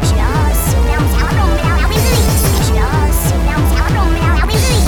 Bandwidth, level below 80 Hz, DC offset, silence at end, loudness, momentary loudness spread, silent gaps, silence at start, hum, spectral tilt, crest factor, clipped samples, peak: 19.5 kHz; -14 dBFS; under 0.1%; 0 s; -13 LUFS; 2 LU; none; 0 s; none; -5 dB/octave; 10 dB; under 0.1%; 0 dBFS